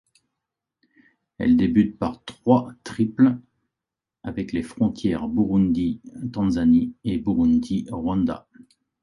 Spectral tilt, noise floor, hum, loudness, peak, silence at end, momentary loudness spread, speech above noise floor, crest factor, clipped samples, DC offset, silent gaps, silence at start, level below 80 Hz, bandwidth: -8 dB/octave; -87 dBFS; none; -22 LUFS; -2 dBFS; 0.65 s; 13 LU; 66 dB; 20 dB; under 0.1%; under 0.1%; none; 1.4 s; -46 dBFS; 11 kHz